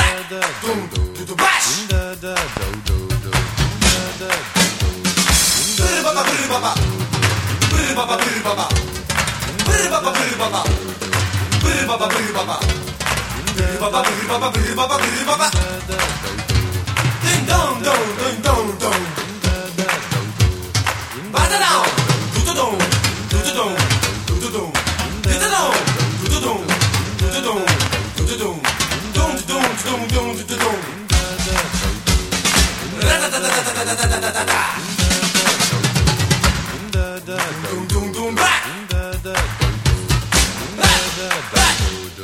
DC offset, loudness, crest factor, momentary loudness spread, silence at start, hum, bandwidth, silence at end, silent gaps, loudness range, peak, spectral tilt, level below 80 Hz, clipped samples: under 0.1%; -17 LUFS; 18 dB; 7 LU; 0 s; none; 17 kHz; 0 s; none; 3 LU; 0 dBFS; -3 dB/octave; -26 dBFS; under 0.1%